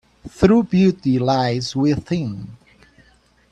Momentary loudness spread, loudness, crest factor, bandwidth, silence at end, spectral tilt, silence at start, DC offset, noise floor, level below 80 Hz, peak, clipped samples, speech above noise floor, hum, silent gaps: 13 LU; -18 LUFS; 18 dB; 9 kHz; 0.95 s; -7 dB/octave; 0.25 s; under 0.1%; -56 dBFS; -44 dBFS; 0 dBFS; under 0.1%; 38 dB; none; none